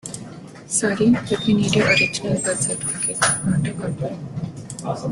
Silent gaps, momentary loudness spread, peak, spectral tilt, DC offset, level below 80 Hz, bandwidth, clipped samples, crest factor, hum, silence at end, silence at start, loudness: none; 15 LU; -4 dBFS; -4 dB/octave; under 0.1%; -50 dBFS; 12.5 kHz; under 0.1%; 18 dB; none; 0 s; 0.05 s; -20 LUFS